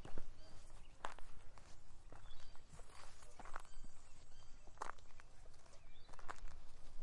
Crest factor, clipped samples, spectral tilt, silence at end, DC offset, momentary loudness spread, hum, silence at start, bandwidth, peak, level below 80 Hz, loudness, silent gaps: 18 dB; under 0.1%; -4 dB/octave; 0 s; under 0.1%; 12 LU; none; 0 s; 11 kHz; -24 dBFS; -54 dBFS; -59 LUFS; none